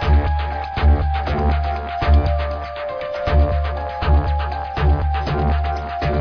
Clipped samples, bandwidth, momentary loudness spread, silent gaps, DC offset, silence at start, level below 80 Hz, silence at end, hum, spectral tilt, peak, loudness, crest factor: under 0.1%; 5.4 kHz; 7 LU; none; 0.2%; 0 s; -20 dBFS; 0 s; none; -8.5 dB/octave; -6 dBFS; -20 LUFS; 12 dB